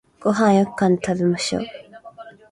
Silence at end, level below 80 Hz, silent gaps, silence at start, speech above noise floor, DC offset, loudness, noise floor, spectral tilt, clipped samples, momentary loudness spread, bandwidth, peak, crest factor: 0.2 s; -56 dBFS; none; 0.2 s; 23 dB; under 0.1%; -20 LUFS; -42 dBFS; -5.5 dB/octave; under 0.1%; 19 LU; 11.5 kHz; -4 dBFS; 18 dB